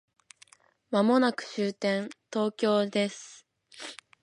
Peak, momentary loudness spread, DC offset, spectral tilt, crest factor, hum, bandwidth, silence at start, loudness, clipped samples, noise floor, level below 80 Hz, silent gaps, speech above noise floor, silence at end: -10 dBFS; 19 LU; under 0.1%; -5 dB/octave; 20 dB; none; 11.5 kHz; 0.9 s; -28 LUFS; under 0.1%; -60 dBFS; -80 dBFS; none; 33 dB; 0.3 s